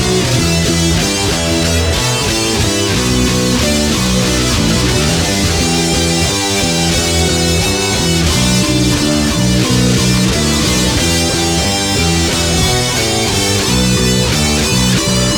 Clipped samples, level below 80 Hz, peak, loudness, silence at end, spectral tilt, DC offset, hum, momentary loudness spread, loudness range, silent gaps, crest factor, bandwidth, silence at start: under 0.1%; -24 dBFS; -2 dBFS; -12 LUFS; 0 s; -3.5 dB/octave; under 0.1%; none; 1 LU; 1 LU; none; 12 dB; 19.5 kHz; 0 s